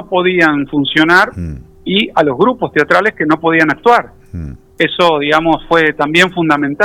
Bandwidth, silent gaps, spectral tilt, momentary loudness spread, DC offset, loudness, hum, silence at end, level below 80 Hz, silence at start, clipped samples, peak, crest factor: 17.5 kHz; none; -5.5 dB/octave; 16 LU; under 0.1%; -11 LUFS; none; 0 s; -40 dBFS; 0 s; 0.1%; 0 dBFS; 12 dB